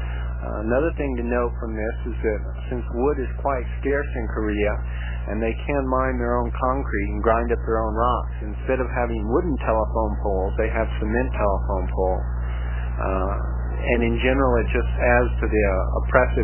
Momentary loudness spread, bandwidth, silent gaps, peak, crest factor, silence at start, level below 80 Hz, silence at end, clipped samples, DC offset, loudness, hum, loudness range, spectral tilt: 8 LU; 3.2 kHz; none; -2 dBFS; 20 dB; 0 s; -26 dBFS; 0 s; under 0.1%; 0.1%; -23 LUFS; 60 Hz at -25 dBFS; 4 LU; -11.5 dB/octave